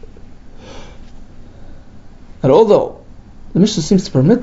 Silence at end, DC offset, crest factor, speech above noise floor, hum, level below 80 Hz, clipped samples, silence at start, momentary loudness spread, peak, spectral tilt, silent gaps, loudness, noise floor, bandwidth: 0 s; under 0.1%; 16 dB; 24 dB; none; -36 dBFS; under 0.1%; 0.3 s; 26 LU; 0 dBFS; -7 dB/octave; none; -13 LUFS; -36 dBFS; 8 kHz